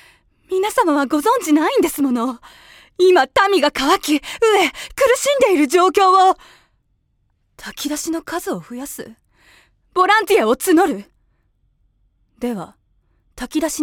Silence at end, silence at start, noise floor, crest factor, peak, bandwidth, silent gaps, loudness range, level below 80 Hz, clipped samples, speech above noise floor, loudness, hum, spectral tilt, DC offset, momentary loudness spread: 0 s; 0.5 s; -64 dBFS; 18 dB; 0 dBFS; 18 kHz; none; 8 LU; -52 dBFS; under 0.1%; 48 dB; -16 LUFS; none; -2.5 dB/octave; under 0.1%; 17 LU